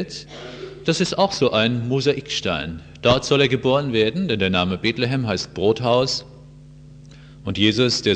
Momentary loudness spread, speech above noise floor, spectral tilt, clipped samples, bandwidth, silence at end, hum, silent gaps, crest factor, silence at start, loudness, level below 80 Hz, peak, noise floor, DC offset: 12 LU; 23 dB; -5 dB/octave; under 0.1%; 9.6 kHz; 0 s; none; none; 18 dB; 0 s; -20 LUFS; -48 dBFS; -2 dBFS; -43 dBFS; under 0.1%